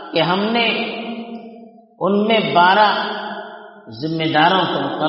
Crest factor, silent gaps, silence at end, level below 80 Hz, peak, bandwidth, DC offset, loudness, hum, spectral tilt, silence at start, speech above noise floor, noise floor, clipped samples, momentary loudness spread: 18 dB; none; 0 s; -64 dBFS; 0 dBFS; 5.8 kHz; under 0.1%; -16 LUFS; none; -2.5 dB/octave; 0 s; 25 dB; -42 dBFS; under 0.1%; 20 LU